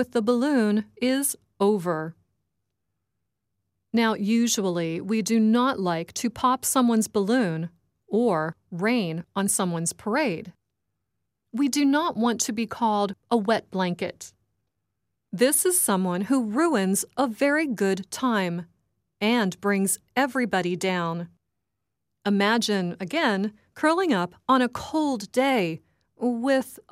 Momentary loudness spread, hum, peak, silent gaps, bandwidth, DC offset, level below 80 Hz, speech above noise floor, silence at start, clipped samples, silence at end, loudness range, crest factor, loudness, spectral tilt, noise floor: 8 LU; none; -8 dBFS; none; 16 kHz; under 0.1%; -68 dBFS; 59 dB; 0 s; under 0.1%; 0.1 s; 4 LU; 16 dB; -24 LUFS; -4 dB/octave; -83 dBFS